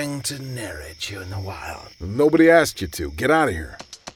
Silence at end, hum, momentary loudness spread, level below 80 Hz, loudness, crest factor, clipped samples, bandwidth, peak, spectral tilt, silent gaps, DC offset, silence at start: 0.05 s; none; 19 LU; -42 dBFS; -20 LUFS; 20 dB; under 0.1%; 17.5 kHz; -2 dBFS; -5 dB/octave; none; under 0.1%; 0 s